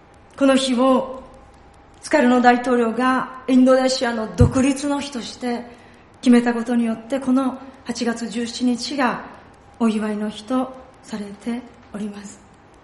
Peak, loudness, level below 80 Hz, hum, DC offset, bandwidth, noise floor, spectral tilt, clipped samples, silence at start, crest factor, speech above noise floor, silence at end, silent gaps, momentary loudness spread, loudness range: 0 dBFS; -20 LUFS; -42 dBFS; none; under 0.1%; 11.5 kHz; -47 dBFS; -5.5 dB/octave; under 0.1%; 0.35 s; 20 dB; 28 dB; 0.5 s; none; 16 LU; 8 LU